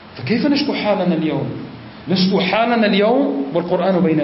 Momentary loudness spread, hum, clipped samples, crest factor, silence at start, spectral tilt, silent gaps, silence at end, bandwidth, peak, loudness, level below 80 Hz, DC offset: 10 LU; none; under 0.1%; 12 dB; 0 s; -9.5 dB/octave; none; 0 s; 5.8 kHz; -4 dBFS; -17 LUFS; -56 dBFS; under 0.1%